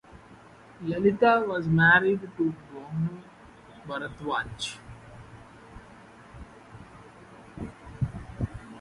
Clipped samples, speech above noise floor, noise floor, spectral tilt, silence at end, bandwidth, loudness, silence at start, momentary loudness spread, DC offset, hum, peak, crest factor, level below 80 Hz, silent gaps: under 0.1%; 26 dB; -51 dBFS; -6.5 dB/octave; 0 s; 11.5 kHz; -26 LUFS; 0.15 s; 27 LU; under 0.1%; none; -8 dBFS; 22 dB; -52 dBFS; none